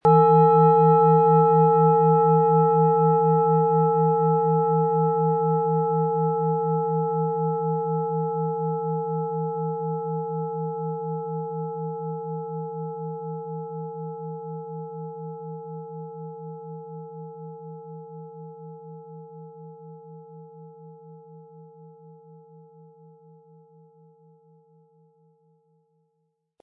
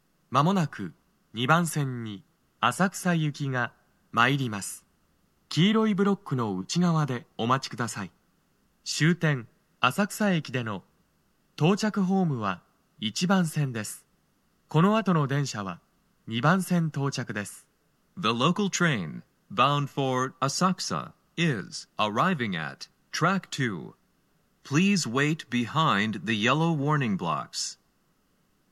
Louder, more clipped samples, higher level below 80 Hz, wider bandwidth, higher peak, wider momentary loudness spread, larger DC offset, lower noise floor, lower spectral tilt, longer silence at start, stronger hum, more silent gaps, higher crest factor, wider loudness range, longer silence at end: first, -22 LUFS vs -27 LUFS; neither; about the same, -74 dBFS vs -74 dBFS; second, 2.7 kHz vs 14 kHz; about the same, -6 dBFS vs -6 dBFS; first, 24 LU vs 14 LU; neither; first, -75 dBFS vs -69 dBFS; first, -13 dB/octave vs -5 dB/octave; second, 0.05 s vs 0.3 s; neither; neither; about the same, 18 dB vs 22 dB; first, 23 LU vs 2 LU; first, 4.5 s vs 0.95 s